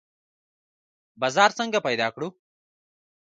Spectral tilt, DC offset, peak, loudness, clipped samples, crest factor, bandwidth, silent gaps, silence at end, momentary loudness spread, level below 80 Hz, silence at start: -3 dB/octave; under 0.1%; -4 dBFS; -23 LUFS; under 0.1%; 24 dB; 9.4 kHz; none; 0.95 s; 13 LU; -74 dBFS; 1.2 s